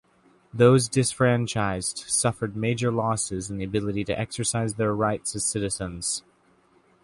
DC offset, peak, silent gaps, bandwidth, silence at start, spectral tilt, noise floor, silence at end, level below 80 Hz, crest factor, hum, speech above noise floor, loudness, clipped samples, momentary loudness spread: under 0.1%; -6 dBFS; none; 11.5 kHz; 0.55 s; -4.5 dB/octave; -61 dBFS; 0.85 s; -52 dBFS; 20 dB; none; 37 dB; -25 LUFS; under 0.1%; 8 LU